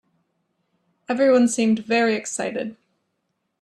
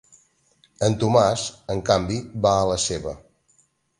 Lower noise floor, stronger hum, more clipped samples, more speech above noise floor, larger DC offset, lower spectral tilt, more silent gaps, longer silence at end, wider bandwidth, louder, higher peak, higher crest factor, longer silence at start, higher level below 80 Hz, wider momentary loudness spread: first, -75 dBFS vs -63 dBFS; neither; neither; first, 55 dB vs 42 dB; neither; about the same, -4 dB/octave vs -5 dB/octave; neither; about the same, 0.9 s vs 0.8 s; about the same, 12 kHz vs 11.5 kHz; about the same, -21 LUFS vs -22 LUFS; second, -8 dBFS vs -2 dBFS; second, 16 dB vs 22 dB; first, 1.1 s vs 0.8 s; second, -70 dBFS vs -46 dBFS; about the same, 12 LU vs 11 LU